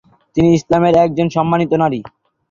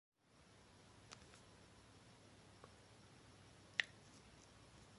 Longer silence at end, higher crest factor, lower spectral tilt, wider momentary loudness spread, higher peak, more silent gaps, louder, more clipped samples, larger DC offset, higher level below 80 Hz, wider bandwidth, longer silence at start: first, 0.45 s vs 0 s; second, 14 dB vs 40 dB; first, -7.5 dB/octave vs -2 dB/octave; second, 7 LU vs 21 LU; first, 0 dBFS vs -18 dBFS; neither; first, -14 LUFS vs -51 LUFS; neither; neither; first, -46 dBFS vs -76 dBFS; second, 7.4 kHz vs 11.5 kHz; first, 0.35 s vs 0.2 s